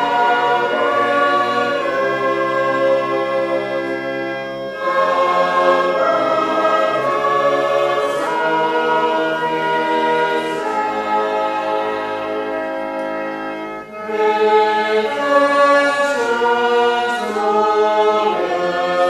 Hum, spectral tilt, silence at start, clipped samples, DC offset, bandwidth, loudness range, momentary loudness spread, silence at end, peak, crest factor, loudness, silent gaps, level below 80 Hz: none; -4 dB/octave; 0 s; under 0.1%; under 0.1%; 13.5 kHz; 4 LU; 8 LU; 0 s; -2 dBFS; 16 dB; -17 LUFS; none; -60 dBFS